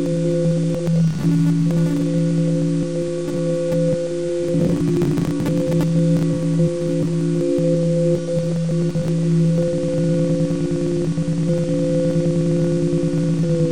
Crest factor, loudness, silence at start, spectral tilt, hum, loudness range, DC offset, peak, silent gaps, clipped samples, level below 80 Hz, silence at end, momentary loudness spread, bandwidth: 12 dB; -19 LUFS; 0 s; -8 dB/octave; none; 1 LU; 2%; -6 dBFS; none; under 0.1%; -44 dBFS; 0 s; 3 LU; 10.5 kHz